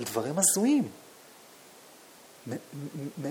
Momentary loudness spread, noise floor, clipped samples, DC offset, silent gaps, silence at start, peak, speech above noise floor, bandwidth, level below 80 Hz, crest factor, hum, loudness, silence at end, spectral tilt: 19 LU; -53 dBFS; under 0.1%; under 0.1%; none; 0 s; -10 dBFS; 24 dB; 20 kHz; -78 dBFS; 22 dB; none; -28 LUFS; 0 s; -4 dB/octave